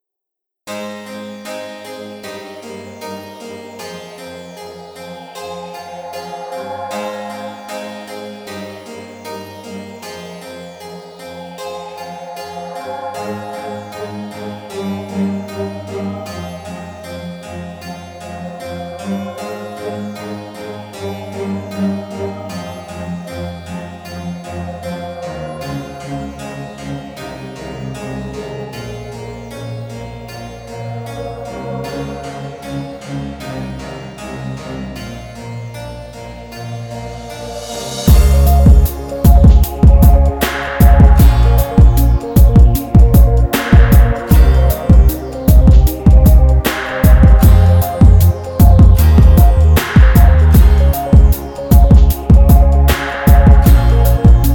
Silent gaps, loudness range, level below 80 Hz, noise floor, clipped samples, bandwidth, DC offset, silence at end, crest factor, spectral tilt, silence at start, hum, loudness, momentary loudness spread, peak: none; 19 LU; -14 dBFS; -81 dBFS; under 0.1%; 19 kHz; under 0.1%; 0 s; 12 dB; -7 dB/octave; 0.65 s; none; -11 LUFS; 21 LU; 0 dBFS